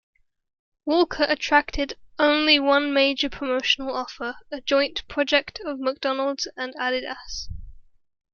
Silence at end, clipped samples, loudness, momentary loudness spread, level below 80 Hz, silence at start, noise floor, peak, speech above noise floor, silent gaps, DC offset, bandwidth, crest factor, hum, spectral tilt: 0.55 s; under 0.1%; -23 LUFS; 14 LU; -46 dBFS; 0.85 s; -43 dBFS; -2 dBFS; 20 dB; none; under 0.1%; 7.2 kHz; 22 dB; none; -3 dB/octave